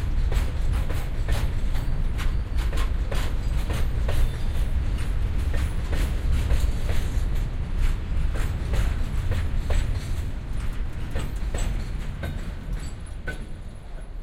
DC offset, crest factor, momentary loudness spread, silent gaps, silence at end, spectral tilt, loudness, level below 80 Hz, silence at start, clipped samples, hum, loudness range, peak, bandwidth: under 0.1%; 14 dB; 8 LU; none; 0 s; -6 dB/octave; -29 LUFS; -24 dBFS; 0 s; under 0.1%; none; 5 LU; -10 dBFS; 15.5 kHz